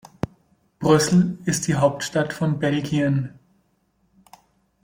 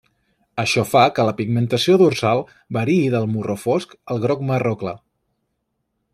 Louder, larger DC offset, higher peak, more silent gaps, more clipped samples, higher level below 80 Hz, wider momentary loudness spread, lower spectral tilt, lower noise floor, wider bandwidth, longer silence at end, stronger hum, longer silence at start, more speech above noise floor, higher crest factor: second, -22 LUFS vs -19 LUFS; neither; about the same, -4 dBFS vs -2 dBFS; neither; neither; first, -54 dBFS vs -60 dBFS; about the same, 15 LU vs 13 LU; about the same, -5.5 dB/octave vs -6 dB/octave; second, -66 dBFS vs -73 dBFS; about the same, 16.5 kHz vs 15 kHz; first, 1.55 s vs 1.15 s; neither; first, 0.8 s vs 0.55 s; second, 46 dB vs 55 dB; about the same, 20 dB vs 18 dB